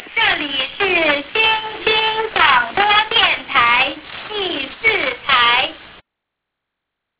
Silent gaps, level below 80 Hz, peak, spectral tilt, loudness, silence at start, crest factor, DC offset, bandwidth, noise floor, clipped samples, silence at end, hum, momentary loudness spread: none; -48 dBFS; 0 dBFS; -5.5 dB/octave; -15 LUFS; 0 s; 18 dB; under 0.1%; 4 kHz; -79 dBFS; under 0.1%; 1.25 s; none; 9 LU